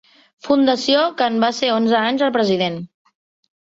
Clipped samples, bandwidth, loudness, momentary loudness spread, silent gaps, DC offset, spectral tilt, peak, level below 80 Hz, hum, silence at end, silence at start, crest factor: under 0.1%; 7.8 kHz; -17 LUFS; 10 LU; none; under 0.1%; -4.5 dB/octave; -4 dBFS; -62 dBFS; none; 0.95 s; 0.45 s; 14 dB